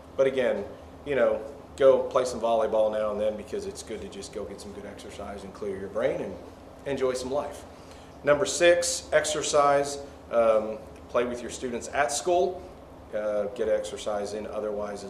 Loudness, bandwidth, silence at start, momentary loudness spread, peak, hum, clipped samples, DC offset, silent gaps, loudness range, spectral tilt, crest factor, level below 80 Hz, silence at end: -27 LUFS; 14 kHz; 0 s; 18 LU; -8 dBFS; none; under 0.1%; under 0.1%; none; 9 LU; -3.5 dB/octave; 20 dB; -54 dBFS; 0 s